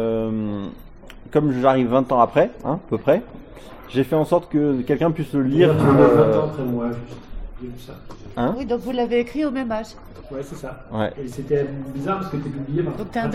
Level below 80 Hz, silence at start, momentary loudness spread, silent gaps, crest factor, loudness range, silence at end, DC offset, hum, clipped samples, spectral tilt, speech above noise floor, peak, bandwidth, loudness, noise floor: -42 dBFS; 0 s; 20 LU; none; 20 dB; 8 LU; 0 s; under 0.1%; none; under 0.1%; -8 dB/octave; 20 dB; -2 dBFS; 15.5 kHz; -20 LUFS; -40 dBFS